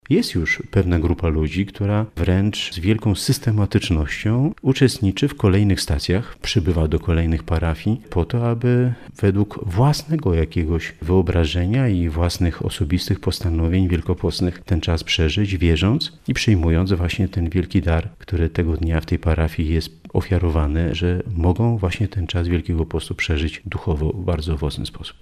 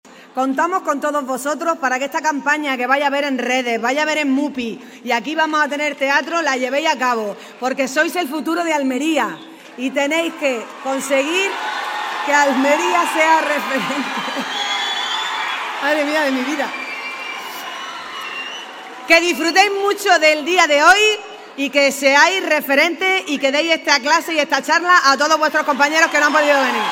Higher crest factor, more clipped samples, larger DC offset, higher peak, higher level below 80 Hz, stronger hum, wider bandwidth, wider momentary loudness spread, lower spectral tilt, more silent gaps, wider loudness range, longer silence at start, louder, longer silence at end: about the same, 16 dB vs 18 dB; neither; neither; second, -4 dBFS vs 0 dBFS; first, -30 dBFS vs -66 dBFS; neither; second, 13.5 kHz vs 16.5 kHz; second, 6 LU vs 12 LU; first, -6.5 dB/octave vs -1.5 dB/octave; neither; second, 2 LU vs 6 LU; about the same, 0.1 s vs 0.05 s; second, -20 LUFS vs -16 LUFS; about the same, 0.1 s vs 0 s